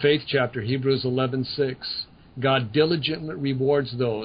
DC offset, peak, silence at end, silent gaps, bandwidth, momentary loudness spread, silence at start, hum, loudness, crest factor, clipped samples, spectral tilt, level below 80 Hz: under 0.1%; -6 dBFS; 0 s; none; 5.2 kHz; 7 LU; 0 s; none; -24 LUFS; 18 dB; under 0.1%; -11 dB/octave; -56 dBFS